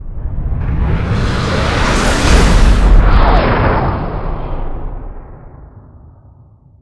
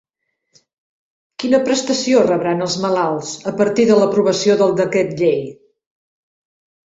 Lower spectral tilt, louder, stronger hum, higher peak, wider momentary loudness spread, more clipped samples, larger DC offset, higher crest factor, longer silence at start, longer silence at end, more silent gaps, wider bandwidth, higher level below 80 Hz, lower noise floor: about the same, -5.5 dB/octave vs -4.5 dB/octave; about the same, -14 LUFS vs -16 LUFS; neither; about the same, 0 dBFS vs -2 dBFS; first, 16 LU vs 10 LU; first, 0.3% vs under 0.1%; neither; about the same, 12 dB vs 16 dB; second, 0 s vs 1.4 s; second, 1.05 s vs 1.4 s; neither; first, 11 kHz vs 8 kHz; first, -14 dBFS vs -60 dBFS; second, -43 dBFS vs -73 dBFS